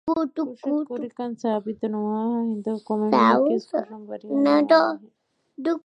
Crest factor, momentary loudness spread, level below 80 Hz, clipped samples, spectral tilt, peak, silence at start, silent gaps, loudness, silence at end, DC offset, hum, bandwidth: 18 dB; 13 LU; -72 dBFS; under 0.1%; -7 dB/octave; -4 dBFS; 0.05 s; none; -23 LUFS; 0.1 s; under 0.1%; none; 8 kHz